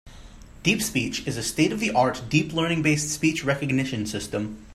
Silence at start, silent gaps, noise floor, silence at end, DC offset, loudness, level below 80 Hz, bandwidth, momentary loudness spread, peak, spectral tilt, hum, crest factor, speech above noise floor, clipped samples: 0.05 s; none; -44 dBFS; 0 s; under 0.1%; -24 LUFS; -48 dBFS; 15.5 kHz; 7 LU; -6 dBFS; -4.5 dB/octave; none; 18 dB; 20 dB; under 0.1%